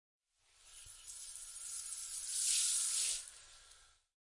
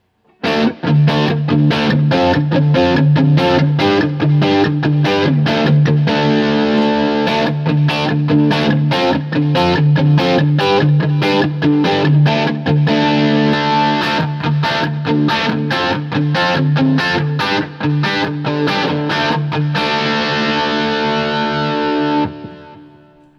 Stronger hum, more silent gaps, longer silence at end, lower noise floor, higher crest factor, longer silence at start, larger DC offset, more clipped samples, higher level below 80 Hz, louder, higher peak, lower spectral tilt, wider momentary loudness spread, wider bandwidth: neither; neither; about the same, 0.45 s vs 0.55 s; first, -69 dBFS vs -45 dBFS; first, 22 dB vs 14 dB; first, 0.65 s vs 0.45 s; neither; neither; second, -72 dBFS vs -52 dBFS; second, -36 LUFS vs -14 LUFS; second, -20 dBFS vs 0 dBFS; second, 4.5 dB/octave vs -7 dB/octave; first, 24 LU vs 4 LU; first, 11.5 kHz vs 7 kHz